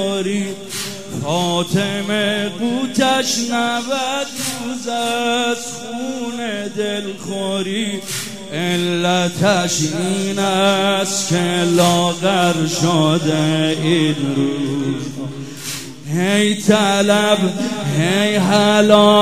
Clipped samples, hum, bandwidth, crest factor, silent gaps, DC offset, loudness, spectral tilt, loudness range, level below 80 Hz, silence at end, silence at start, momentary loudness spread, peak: under 0.1%; none; 16 kHz; 18 dB; none; 0.9%; -17 LUFS; -4.5 dB/octave; 6 LU; -58 dBFS; 0 s; 0 s; 11 LU; 0 dBFS